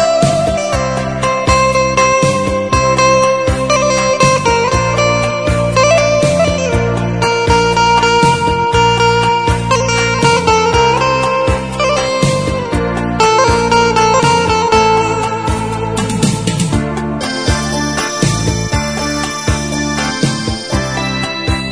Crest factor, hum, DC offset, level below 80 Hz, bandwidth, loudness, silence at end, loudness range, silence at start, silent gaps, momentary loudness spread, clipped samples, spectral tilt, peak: 12 dB; none; 0.5%; -26 dBFS; 11 kHz; -12 LUFS; 0 s; 4 LU; 0 s; none; 6 LU; under 0.1%; -4.5 dB/octave; 0 dBFS